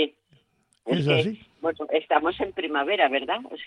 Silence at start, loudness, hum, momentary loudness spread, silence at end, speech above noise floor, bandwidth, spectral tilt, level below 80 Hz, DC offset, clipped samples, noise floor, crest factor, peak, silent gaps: 0 s; -25 LUFS; none; 8 LU; 0 s; 42 dB; 10.5 kHz; -6.5 dB/octave; -62 dBFS; under 0.1%; under 0.1%; -66 dBFS; 20 dB; -6 dBFS; none